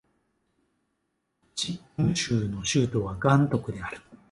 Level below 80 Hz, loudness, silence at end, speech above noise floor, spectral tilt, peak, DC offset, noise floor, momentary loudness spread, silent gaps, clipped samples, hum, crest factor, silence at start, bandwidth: -52 dBFS; -27 LUFS; 0.15 s; 52 dB; -5 dB/octave; -8 dBFS; under 0.1%; -78 dBFS; 14 LU; none; under 0.1%; none; 20 dB; 1.55 s; 11.5 kHz